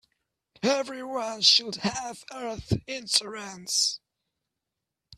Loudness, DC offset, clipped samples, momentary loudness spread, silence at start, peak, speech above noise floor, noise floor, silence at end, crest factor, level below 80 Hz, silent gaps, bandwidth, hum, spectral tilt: -25 LUFS; under 0.1%; under 0.1%; 18 LU; 0.6 s; -6 dBFS; 58 dB; -86 dBFS; 0 s; 24 dB; -56 dBFS; none; 15.5 kHz; none; -2.5 dB/octave